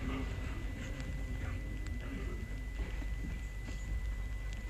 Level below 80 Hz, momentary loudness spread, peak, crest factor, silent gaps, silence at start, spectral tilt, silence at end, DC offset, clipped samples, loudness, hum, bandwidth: -40 dBFS; 2 LU; -26 dBFS; 12 dB; none; 0 s; -6 dB/octave; 0 s; under 0.1%; under 0.1%; -42 LUFS; none; 14 kHz